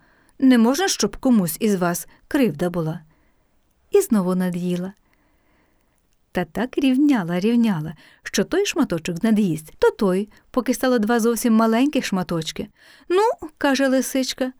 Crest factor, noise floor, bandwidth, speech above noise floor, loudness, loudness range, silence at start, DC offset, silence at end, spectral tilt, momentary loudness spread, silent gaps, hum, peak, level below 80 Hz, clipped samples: 16 dB; -63 dBFS; over 20 kHz; 43 dB; -21 LUFS; 4 LU; 0.4 s; under 0.1%; 0.1 s; -5 dB/octave; 10 LU; none; none; -4 dBFS; -52 dBFS; under 0.1%